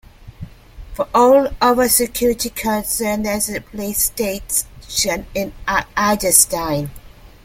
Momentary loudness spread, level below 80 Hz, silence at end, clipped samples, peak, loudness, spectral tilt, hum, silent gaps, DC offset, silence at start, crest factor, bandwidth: 13 LU; -38 dBFS; 0.15 s; under 0.1%; 0 dBFS; -17 LUFS; -2.5 dB/octave; none; none; under 0.1%; 0.2 s; 18 dB; 16.5 kHz